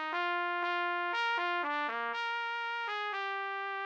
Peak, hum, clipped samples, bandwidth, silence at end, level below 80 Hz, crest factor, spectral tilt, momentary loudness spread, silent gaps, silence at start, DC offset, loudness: -22 dBFS; none; under 0.1%; 8.6 kHz; 0 s; under -90 dBFS; 14 dB; -1 dB/octave; 4 LU; none; 0 s; under 0.1%; -34 LUFS